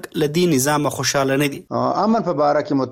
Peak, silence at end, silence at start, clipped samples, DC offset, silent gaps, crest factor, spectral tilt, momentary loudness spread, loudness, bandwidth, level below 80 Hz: -6 dBFS; 0 s; 0.05 s; under 0.1%; under 0.1%; none; 12 dB; -4.5 dB/octave; 4 LU; -19 LUFS; 16.5 kHz; -56 dBFS